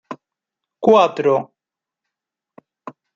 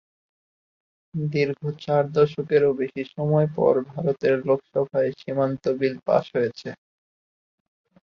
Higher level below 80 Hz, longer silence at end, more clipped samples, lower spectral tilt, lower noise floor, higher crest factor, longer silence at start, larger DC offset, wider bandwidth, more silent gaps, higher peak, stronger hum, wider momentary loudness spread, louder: second, -72 dBFS vs -64 dBFS; second, 0.25 s vs 1.35 s; neither; second, -6 dB/octave vs -8.5 dB/octave; about the same, -87 dBFS vs under -90 dBFS; about the same, 20 dB vs 18 dB; second, 0.1 s vs 1.15 s; neither; about the same, 7.4 kHz vs 6.8 kHz; neither; first, -2 dBFS vs -6 dBFS; neither; first, 24 LU vs 8 LU; first, -16 LUFS vs -23 LUFS